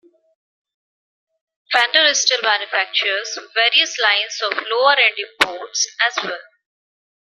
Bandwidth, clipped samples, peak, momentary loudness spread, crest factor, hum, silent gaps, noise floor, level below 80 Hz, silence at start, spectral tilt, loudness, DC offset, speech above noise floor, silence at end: 14.5 kHz; under 0.1%; 0 dBFS; 9 LU; 20 dB; none; none; under -90 dBFS; -66 dBFS; 1.7 s; 1.5 dB/octave; -16 LUFS; under 0.1%; over 72 dB; 0.85 s